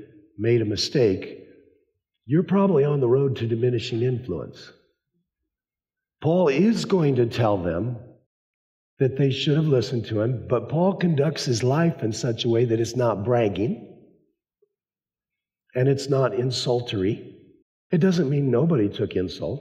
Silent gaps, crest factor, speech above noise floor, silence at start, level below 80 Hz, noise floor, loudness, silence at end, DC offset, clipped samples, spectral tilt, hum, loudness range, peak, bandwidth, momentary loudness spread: 8.26-8.97 s, 17.62-17.90 s; 14 dB; over 68 dB; 0 s; -62 dBFS; under -90 dBFS; -23 LUFS; 0 s; under 0.1%; under 0.1%; -7 dB/octave; none; 4 LU; -10 dBFS; 12 kHz; 8 LU